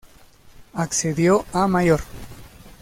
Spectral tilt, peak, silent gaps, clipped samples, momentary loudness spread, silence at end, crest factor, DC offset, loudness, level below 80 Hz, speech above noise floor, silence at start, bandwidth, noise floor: -5 dB/octave; -6 dBFS; none; under 0.1%; 21 LU; 0.1 s; 16 dB; under 0.1%; -20 LUFS; -44 dBFS; 29 dB; 0.6 s; 16.5 kHz; -49 dBFS